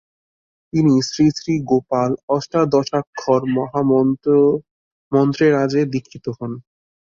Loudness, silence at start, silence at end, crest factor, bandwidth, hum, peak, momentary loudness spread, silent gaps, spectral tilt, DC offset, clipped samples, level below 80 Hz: -18 LUFS; 0.75 s; 0.5 s; 16 dB; 7.6 kHz; none; -2 dBFS; 11 LU; 2.23-2.28 s, 3.07-3.13 s, 4.71-5.11 s; -7 dB/octave; under 0.1%; under 0.1%; -54 dBFS